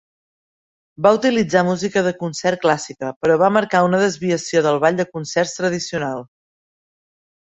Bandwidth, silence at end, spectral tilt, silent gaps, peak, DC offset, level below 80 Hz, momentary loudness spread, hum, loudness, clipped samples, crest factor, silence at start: 8.4 kHz; 1.3 s; -5 dB/octave; 3.16-3.21 s; 0 dBFS; under 0.1%; -60 dBFS; 8 LU; none; -18 LUFS; under 0.1%; 18 dB; 1 s